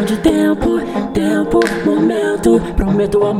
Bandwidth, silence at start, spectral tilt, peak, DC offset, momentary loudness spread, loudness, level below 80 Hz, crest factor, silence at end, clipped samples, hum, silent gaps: 15.5 kHz; 0 s; -6.5 dB/octave; 0 dBFS; under 0.1%; 4 LU; -15 LUFS; -28 dBFS; 14 dB; 0 s; under 0.1%; none; none